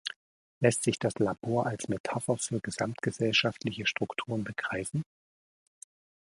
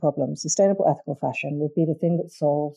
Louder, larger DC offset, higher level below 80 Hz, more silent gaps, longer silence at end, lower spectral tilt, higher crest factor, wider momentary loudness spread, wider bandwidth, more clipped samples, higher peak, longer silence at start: second, -31 LUFS vs -24 LUFS; neither; first, -64 dBFS vs -74 dBFS; first, 0.16-0.61 s, 2.00-2.04 s vs none; first, 1.25 s vs 0.05 s; about the same, -4.5 dB/octave vs -5.5 dB/octave; first, 24 dB vs 14 dB; about the same, 8 LU vs 7 LU; about the same, 11.5 kHz vs 11 kHz; neither; about the same, -8 dBFS vs -8 dBFS; about the same, 0.05 s vs 0 s